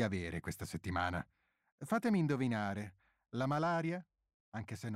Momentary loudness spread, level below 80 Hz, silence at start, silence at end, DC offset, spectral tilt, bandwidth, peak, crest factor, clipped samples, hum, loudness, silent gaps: 14 LU; -62 dBFS; 0 s; 0 s; under 0.1%; -6.5 dB/octave; 16 kHz; -22 dBFS; 16 dB; under 0.1%; none; -38 LUFS; 1.72-1.78 s, 4.34-4.52 s